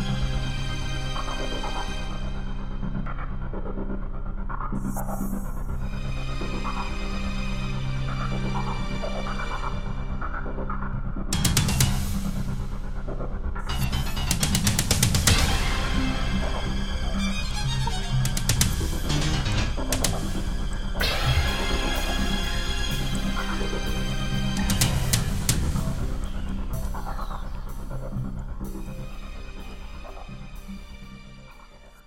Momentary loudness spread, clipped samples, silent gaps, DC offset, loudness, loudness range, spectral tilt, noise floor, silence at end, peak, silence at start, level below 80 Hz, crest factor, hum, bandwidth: 14 LU; under 0.1%; none; under 0.1%; -28 LUFS; 10 LU; -4 dB/octave; -47 dBFS; 0.05 s; 0 dBFS; 0 s; -28 dBFS; 26 dB; none; 16.5 kHz